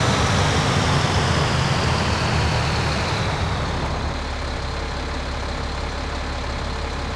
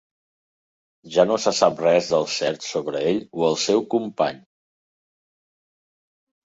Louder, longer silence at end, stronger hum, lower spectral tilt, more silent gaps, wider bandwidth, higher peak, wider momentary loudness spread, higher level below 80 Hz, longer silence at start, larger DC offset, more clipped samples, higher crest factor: about the same, -22 LUFS vs -21 LUFS; second, 0 s vs 2.1 s; neither; about the same, -4.5 dB/octave vs -4 dB/octave; neither; first, 11 kHz vs 8 kHz; second, -8 dBFS vs -2 dBFS; about the same, 8 LU vs 7 LU; first, -30 dBFS vs -66 dBFS; second, 0 s vs 1.05 s; neither; neither; second, 14 dB vs 22 dB